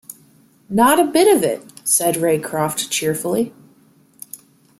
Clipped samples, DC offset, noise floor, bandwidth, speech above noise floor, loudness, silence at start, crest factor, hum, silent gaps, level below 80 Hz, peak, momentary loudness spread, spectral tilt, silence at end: under 0.1%; under 0.1%; -53 dBFS; 16.5 kHz; 36 dB; -17 LUFS; 0.1 s; 18 dB; none; none; -60 dBFS; -2 dBFS; 22 LU; -3.5 dB/octave; 0.45 s